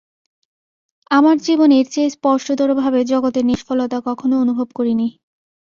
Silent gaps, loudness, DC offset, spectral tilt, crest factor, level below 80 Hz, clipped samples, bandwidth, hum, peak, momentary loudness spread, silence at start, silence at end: none; -16 LUFS; under 0.1%; -5 dB/octave; 16 dB; -58 dBFS; under 0.1%; 7.4 kHz; none; -2 dBFS; 7 LU; 1.1 s; 0.7 s